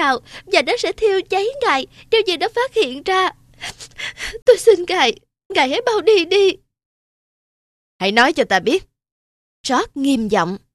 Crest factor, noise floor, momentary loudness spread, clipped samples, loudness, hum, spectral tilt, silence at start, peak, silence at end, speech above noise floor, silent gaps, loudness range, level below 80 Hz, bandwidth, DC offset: 18 dB; under -90 dBFS; 13 LU; under 0.1%; -17 LUFS; none; -3 dB/octave; 0 s; 0 dBFS; 0.15 s; over 73 dB; 4.42-4.46 s, 5.45-5.50 s, 6.85-7.99 s, 9.12-9.64 s; 3 LU; -50 dBFS; 13 kHz; under 0.1%